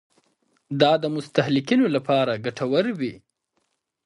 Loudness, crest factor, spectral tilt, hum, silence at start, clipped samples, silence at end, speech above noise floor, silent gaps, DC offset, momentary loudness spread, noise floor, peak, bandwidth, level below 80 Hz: -22 LUFS; 20 dB; -6.5 dB/octave; none; 0.7 s; under 0.1%; 0.9 s; 52 dB; none; under 0.1%; 9 LU; -74 dBFS; -2 dBFS; 11 kHz; -68 dBFS